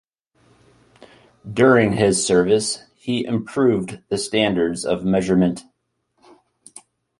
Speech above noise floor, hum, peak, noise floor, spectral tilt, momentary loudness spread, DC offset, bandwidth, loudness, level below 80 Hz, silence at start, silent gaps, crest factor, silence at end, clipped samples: 52 dB; none; -2 dBFS; -70 dBFS; -5 dB/octave; 10 LU; under 0.1%; 11.5 kHz; -19 LUFS; -52 dBFS; 1.45 s; none; 18 dB; 1.6 s; under 0.1%